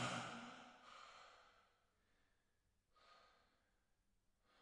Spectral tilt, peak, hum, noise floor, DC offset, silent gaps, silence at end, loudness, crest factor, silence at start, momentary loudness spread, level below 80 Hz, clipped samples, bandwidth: -3.5 dB/octave; -34 dBFS; none; -84 dBFS; under 0.1%; none; 0 s; -54 LUFS; 24 dB; 0 s; 21 LU; -84 dBFS; under 0.1%; 11 kHz